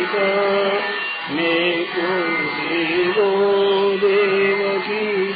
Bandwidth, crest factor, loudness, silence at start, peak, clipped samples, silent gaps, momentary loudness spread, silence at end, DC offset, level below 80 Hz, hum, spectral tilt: 5 kHz; 12 dB; -18 LUFS; 0 s; -6 dBFS; under 0.1%; none; 4 LU; 0 s; under 0.1%; -62 dBFS; none; -8 dB/octave